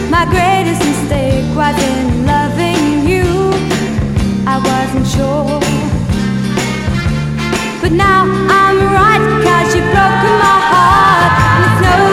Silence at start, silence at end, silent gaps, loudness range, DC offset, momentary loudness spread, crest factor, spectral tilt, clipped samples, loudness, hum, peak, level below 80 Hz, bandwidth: 0 s; 0 s; none; 5 LU; under 0.1%; 7 LU; 10 dB; -5.5 dB/octave; under 0.1%; -11 LUFS; none; 0 dBFS; -26 dBFS; 16 kHz